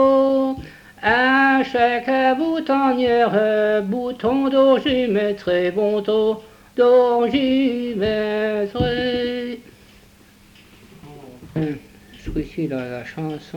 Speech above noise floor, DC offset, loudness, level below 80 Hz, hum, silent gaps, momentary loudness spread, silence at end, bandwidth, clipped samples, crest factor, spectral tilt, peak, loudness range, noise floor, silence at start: 31 dB; under 0.1%; -19 LUFS; -46 dBFS; none; none; 13 LU; 0 s; 18 kHz; under 0.1%; 16 dB; -6.5 dB/octave; -4 dBFS; 12 LU; -49 dBFS; 0 s